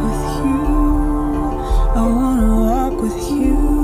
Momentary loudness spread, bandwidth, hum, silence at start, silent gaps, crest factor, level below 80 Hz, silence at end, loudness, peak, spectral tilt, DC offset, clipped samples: 5 LU; 15.5 kHz; none; 0 s; none; 10 dB; -18 dBFS; 0 s; -18 LUFS; -4 dBFS; -7 dB/octave; under 0.1%; under 0.1%